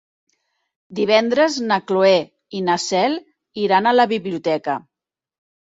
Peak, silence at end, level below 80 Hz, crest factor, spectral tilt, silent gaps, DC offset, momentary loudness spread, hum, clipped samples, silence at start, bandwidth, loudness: -2 dBFS; 0.8 s; -66 dBFS; 18 dB; -4 dB/octave; none; under 0.1%; 13 LU; none; under 0.1%; 0.9 s; 8 kHz; -18 LUFS